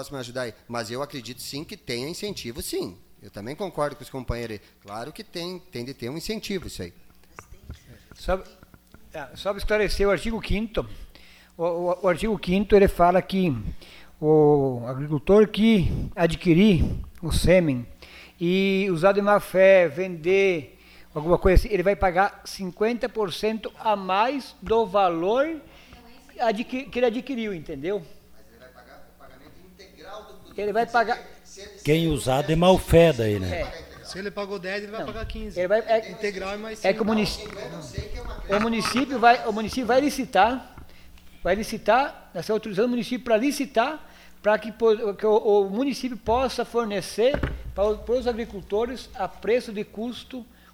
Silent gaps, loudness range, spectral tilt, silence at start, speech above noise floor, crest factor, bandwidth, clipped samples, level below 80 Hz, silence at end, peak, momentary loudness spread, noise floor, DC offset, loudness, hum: none; 12 LU; -6 dB/octave; 0 s; 27 dB; 20 dB; 16.5 kHz; under 0.1%; -38 dBFS; 0.3 s; -4 dBFS; 17 LU; -51 dBFS; under 0.1%; -24 LUFS; none